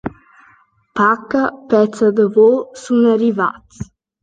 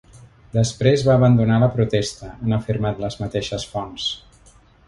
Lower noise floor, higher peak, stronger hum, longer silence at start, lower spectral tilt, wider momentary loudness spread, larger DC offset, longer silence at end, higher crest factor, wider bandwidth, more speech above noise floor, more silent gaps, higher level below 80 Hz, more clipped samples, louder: about the same, -52 dBFS vs -51 dBFS; about the same, -2 dBFS vs -2 dBFS; neither; about the same, 0.05 s vs 0.15 s; about the same, -6.5 dB/octave vs -6.5 dB/octave; first, 20 LU vs 12 LU; neither; second, 0.4 s vs 0.7 s; about the same, 14 dB vs 18 dB; second, 9.2 kHz vs 11.5 kHz; first, 38 dB vs 32 dB; neither; second, -52 dBFS vs -44 dBFS; neither; first, -15 LUFS vs -20 LUFS